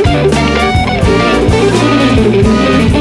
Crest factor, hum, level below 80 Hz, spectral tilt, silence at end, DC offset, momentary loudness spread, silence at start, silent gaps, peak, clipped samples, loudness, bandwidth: 8 dB; none; -20 dBFS; -6 dB/octave; 0 s; under 0.1%; 2 LU; 0 s; none; 0 dBFS; under 0.1%; -9 LUFS; 12 kHz